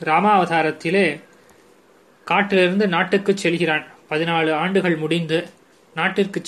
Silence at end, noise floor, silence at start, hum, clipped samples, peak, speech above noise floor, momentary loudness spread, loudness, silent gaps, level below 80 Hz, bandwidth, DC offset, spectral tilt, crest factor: 0 s; -53 dBFS; 0 s; none; under 0.1%; -2 dBFS; 34 dB; 8 LU; -19 LUFS; none; -66 dBFS; 12.5 kHz; under 0.1%; -5.5 dB/octave; 18 dB